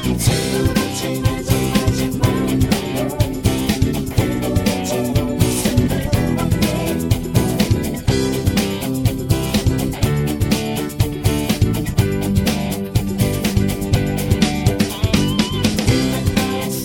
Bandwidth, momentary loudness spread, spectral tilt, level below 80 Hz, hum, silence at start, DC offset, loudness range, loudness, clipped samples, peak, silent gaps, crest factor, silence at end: 17 kHz; 3 LU; -5.5 dB/octave; -28 dBFS; none; 0 s; under 0.1%; 1 LU; -18 LUFS; under 0.1%; 0 dBFS; none; 18 dB; 0 s